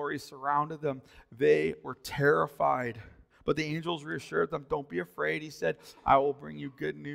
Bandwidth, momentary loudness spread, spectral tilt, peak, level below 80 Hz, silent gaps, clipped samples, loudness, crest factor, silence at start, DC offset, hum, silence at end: 16 kHz; 12 LU; -6 dB/octave; -10 dBFS; -60 dBFS; none; under 0.1%; -31 LUFS; 20 dB; 0 s; under 0.1%; none; 0 s